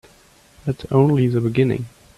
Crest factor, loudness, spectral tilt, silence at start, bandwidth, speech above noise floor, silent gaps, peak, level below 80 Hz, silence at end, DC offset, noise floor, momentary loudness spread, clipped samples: 18 dB; -19 LUFS; -9 dB/octave; 0.65 s; 12 kHz; 34 dB; none; -2 dBFS; -50 dBFS; 0.3 s; under 0.1%; -52 dBFS; 12 LU; under 0.1%